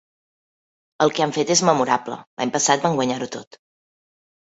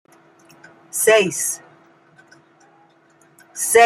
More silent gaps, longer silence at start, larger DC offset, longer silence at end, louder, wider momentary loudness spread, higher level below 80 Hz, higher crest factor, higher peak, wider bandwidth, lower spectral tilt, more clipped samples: first, 2.27-2.37 s vs none; about the same, 1 s vs 0.95 s; neither; first, 1.1 s vs 0 s; about the same, -20 LUFS vs -18 LUFS; second, 12 LU vs 16 LU; about the same, -64 dBFS vs -66 dBFS; about the same, 20 dB vs 20 dB; about the same, -2 dBFS vs -2 dBFS; second, 8.2 kHz vs 16 kHz; first, -3.5 dB/octave vs -1.5 dB/octave; neither